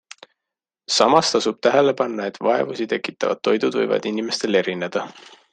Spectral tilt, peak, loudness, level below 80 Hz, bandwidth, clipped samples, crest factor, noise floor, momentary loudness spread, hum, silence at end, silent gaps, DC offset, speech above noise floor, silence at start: -3.5 dB/octave; -2 dBFS; -20 LUFS; -66 dBFS; 9.6 kHz; under 0.1%; 20 dB; -86 dBFS; 9 LU; none; 0.4 s; none; under 0.1%; 65 dB; 0.9 s